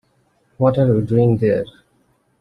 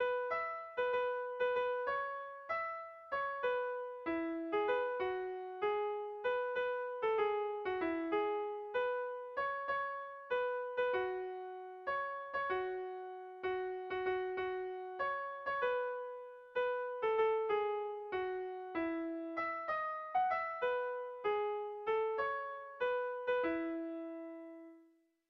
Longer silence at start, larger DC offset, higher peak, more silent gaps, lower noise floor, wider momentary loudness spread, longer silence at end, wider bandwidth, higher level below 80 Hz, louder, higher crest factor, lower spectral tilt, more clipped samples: first, 0.6 s vs 0 s; neither; first, -4 dBFS vs -22 dBFS; neither; second, -61 dBFS vs -69 dBFS; about the same, 6 LU vs 8 LU; first, 0.75 s vs 0.45 s; second, 5 kHz vs 6 kHz; first, -48 dBFS vs -74 dBFS; first, -17 LUFS vs -38 LUFS; about the same, 16 dB vs 16 dB; first, -10.5 dB/octave vs -1.5 dB/octave; neither